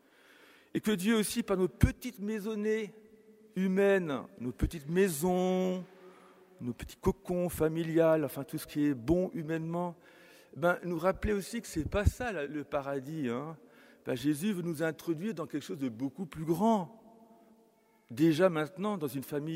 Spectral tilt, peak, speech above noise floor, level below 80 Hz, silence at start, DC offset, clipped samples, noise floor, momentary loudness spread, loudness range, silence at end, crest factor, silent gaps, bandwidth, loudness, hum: -6 dB/octave; -10 dBFS; 35 dB; -48 dBFS; 0.75 s; under 0.1%; under 0.1%; -66 dBFS; 11 LU; 4 LU; 0 s; 22 dB; none; 16 kHz; -32 LUFS; none